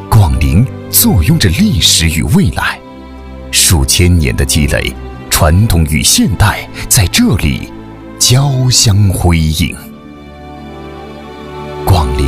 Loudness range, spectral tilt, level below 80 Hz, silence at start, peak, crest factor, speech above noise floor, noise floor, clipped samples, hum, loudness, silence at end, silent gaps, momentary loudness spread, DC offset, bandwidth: 3 LU; -4 dB/octave; -20 dBFS; 0 s; 0 dBFS; 10 dB; 21 dB; -31 dBFS; 0.2%; none; -10 LUFS; 0 s; none; 21 LU; under 0.1%; 16.5 kHz